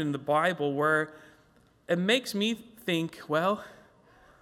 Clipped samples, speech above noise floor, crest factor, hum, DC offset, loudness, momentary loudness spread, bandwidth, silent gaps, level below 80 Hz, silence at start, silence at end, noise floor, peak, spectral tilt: under 0.1%; 34 dB; 18 dB; none; under 0.1%; -28 LUFS; 9 LU; 16.5 kHz; none; -70 dBFS; 0 s; 0.7 s; -62 dBFS; -12 dBFS; -5 dB/octave